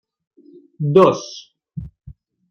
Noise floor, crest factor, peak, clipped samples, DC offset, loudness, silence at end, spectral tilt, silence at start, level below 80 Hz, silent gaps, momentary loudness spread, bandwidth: -35 dBFS; 18 dB; -2 dBFS; under 0.1%; under 0.1%; -16 LUFS; 0.4 s; -7 dB/octave; 0.8 s; -50 dBFS; none; 24 LU; 6.8 kHz